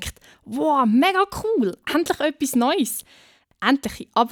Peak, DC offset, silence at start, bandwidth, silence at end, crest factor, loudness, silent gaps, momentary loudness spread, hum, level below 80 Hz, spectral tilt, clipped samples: -4 dBFS; under 0.1%; 0 s; over 20 kHz; 0 s; 18 dB; -21 LUFS; none; 8 LU; none; -50 dBFS; -4 dB/octave; under 0.1%